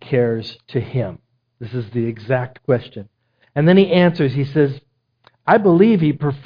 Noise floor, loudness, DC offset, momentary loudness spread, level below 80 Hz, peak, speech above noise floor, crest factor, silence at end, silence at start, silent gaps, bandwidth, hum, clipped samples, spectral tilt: -57 dBFS; -17 LUFS; under 0.1%; 16 LU; -54 dBFS; 0 dBFS; 40 dB; 18 dB; 0.05 s; 0.05 s; none; 5.2 kHz; none; under 0.1%; -10 dB/octave